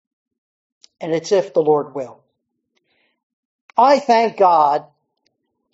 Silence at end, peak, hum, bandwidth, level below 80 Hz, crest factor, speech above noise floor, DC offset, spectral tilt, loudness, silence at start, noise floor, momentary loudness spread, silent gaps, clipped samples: 0.9 s; 0 dBFS; none; 8 kHz; -74 dBFS; 18 dB; 58 dB; under 0.1%; -3.5 dB/octave; -16 LUFS; 1 s; -73 dBFS; 16 LU; 3.23-3.68 s; under 0.1%